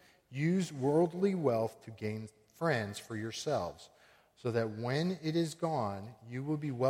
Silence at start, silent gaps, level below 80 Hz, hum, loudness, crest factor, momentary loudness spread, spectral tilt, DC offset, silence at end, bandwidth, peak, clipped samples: 0.3 s; none; -72 dBFS; none; -35 LUFS; 18 dB; 12 LU; -6.5 dB/octave; under 0.1%; 0 s; 16 kHz; -16 dBFS; under 0.1%